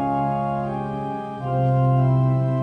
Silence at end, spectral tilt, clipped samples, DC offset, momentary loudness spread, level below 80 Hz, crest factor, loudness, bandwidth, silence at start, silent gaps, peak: 0 s; -10.5 dB/octave; under 0.1%; under 0.1%; 10 LU; -48 dBFS; 12 dB; -22 LUFS; 3.5 kHz; 0 s; none; -10 dBFS